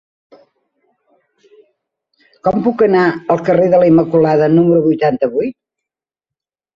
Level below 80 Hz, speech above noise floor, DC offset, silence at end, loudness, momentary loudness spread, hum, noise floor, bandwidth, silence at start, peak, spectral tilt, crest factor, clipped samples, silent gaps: -54 dBFS; 74 dB; under 0.1%; 1.25 s; -13 LUFS; 7 LU; none; -86 dBFS; 6.4 kHz; 2.45 s; -2 dBFS; -9.5 dB/octave; 14 dB; under 0.1%; none